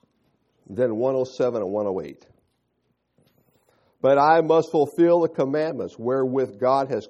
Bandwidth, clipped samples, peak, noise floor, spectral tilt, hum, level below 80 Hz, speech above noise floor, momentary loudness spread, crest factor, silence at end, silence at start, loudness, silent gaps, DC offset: 11.5 kHz; under 0.1%; -4 dBFS; -72 dBFS; -7.5 dB/octave; none; -70 dBFS; 51 dB; 11 LU; 18 dB; 0.05 s; 0.7 s; -22 LUFS; none; under 0.1%